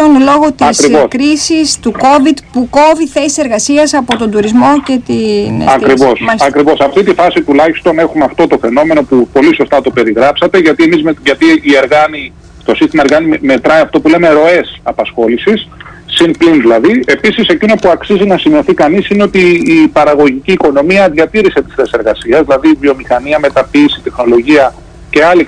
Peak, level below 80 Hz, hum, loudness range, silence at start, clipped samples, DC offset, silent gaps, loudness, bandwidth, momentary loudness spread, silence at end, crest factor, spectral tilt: 0 dBFS; -36 dBFS; none; 1 LU; 0 s; 0.2%; under 0.1%; none; -8 LUFS; 10.5 kHz; 5 LU; 0 s; 8 dB; -4.5 dB/octave